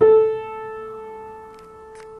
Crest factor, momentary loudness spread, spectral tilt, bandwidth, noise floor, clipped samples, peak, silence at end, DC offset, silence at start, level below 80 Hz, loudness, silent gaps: 18 dB; 25 LU; -7 dB/octave; 3.8 kHz; -41 dBFS; under 0.1%; -4 dBFS; 0 s; under 0.1%; 0 s; -58 dBFS; -21 LUFS; none